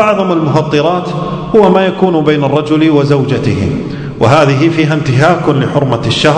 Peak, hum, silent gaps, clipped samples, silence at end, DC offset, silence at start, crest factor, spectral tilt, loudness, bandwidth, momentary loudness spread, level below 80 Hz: 0 dBFS; none; none; 1%; 0 s; under 0.1%; 0 s; 10 dB; -7 dB/octave; -10 LUFS; 9.4 kHz; 7 LU; -38 dBFS